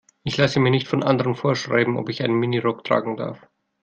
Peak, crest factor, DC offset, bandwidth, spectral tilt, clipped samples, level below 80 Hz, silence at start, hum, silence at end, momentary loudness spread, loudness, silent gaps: -4 dBFS; 18 dB; under 0.1%; 7.6 kHz; -6.5 dB/octave; under 0.1%; -58 dBFS; 0.25 s; none; 0.5 s; 8 LU; -21 LUFS; none